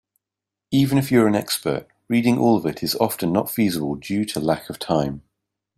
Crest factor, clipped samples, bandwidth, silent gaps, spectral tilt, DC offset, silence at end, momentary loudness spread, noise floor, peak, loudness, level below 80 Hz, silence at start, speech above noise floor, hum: 20 dB; under 0.1%; 16 kHz; none; -5.5 dB/octave; under 0.1%; 0.6 s; 8 LU; -87 dBFS; -2 dBFS; -21 LUFS; -54 dBFS; 0.7 s; 66 dB; none